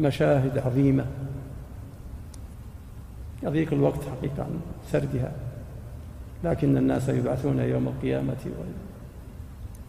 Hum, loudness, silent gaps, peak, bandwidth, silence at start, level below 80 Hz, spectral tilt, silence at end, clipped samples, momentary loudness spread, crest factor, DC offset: none; -27 LUFS; none; -8 dBFS; 15 kHz; 0 s; -42 dBFS; -8.5 dB/octave; 0 s; under 0.1%; 20 LU; 18 dB; under 0.1%